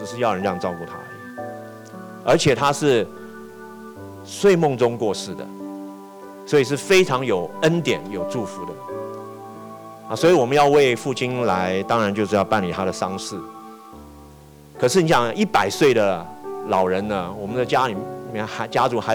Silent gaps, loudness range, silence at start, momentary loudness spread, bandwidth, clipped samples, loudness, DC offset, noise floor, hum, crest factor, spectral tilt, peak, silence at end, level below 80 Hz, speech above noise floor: none; 4 LU; 0 s; 21 LU; over 20 kHz; under 0.1%; -20 LUFS; under 0.1%; -45 dBFS; none; 14 dB; -5 dB/octave; -8 dBFS; 0 s; -56 dBFS; 25 dB